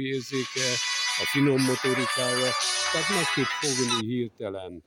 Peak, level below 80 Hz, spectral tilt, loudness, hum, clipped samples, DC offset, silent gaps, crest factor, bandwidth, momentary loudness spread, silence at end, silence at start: -10 dBFS; -66 dBFS; -3 dB/octave; -25 LUFS; none; under 0.1%; under 0.1%; none; 16 dB; 17 kHz; 7 LU; 0.05 s; 0 s